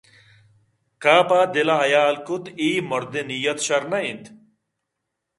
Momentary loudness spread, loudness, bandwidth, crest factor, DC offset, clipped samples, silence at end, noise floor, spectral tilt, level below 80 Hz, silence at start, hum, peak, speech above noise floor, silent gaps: 11 LU; -20 LUFS; 11.5 kHz; 22 dB; under 0.1%; under 0.1%; 1.1 s; -80 dBFS; -3.5 dB/octave; -70 dBFS; 1 s; none; 0 dBFS; 60 dB; none